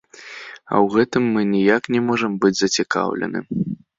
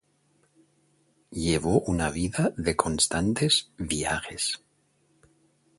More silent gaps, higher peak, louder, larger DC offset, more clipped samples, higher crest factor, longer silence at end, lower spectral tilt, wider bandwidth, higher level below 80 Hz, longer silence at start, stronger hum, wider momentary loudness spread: neither; about the same, -2 dBFS vs -2 dBFS; first, -19 LUFS vs -26 LUFS; neither; neither; second, 18 dB vs 26 dB; second, 0.25 s vs 1.2 s; about the same, -5 dB/octave vs -4 dB/octave; second, 7.8 kHz vs 12 kHz; second, -58 dBFS vs -46 dBFS; second, 0.15 s vs 1.3 s; neither; first, 13 LU vs 7 LU